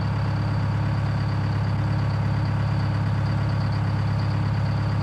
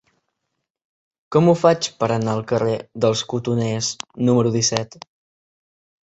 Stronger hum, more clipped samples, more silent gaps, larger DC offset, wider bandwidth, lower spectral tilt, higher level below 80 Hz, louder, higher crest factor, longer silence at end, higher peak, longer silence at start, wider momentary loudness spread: neither; neither; neither; neither; about the same, 8 kHz vs 8.2 kHz; first, -8 dB/octave vs -5 dB/octave; first, -36 dBFS vs -56 dBFS; second, -24 LUFS vs -20 LUFS; second, 10 dB vs 20 dB; second, 0 s vs 1.2 s; second, -14 dBFS vs 0 dBFS; second, 0 s vs 1.3 s; second, 1 LU vs 7 LU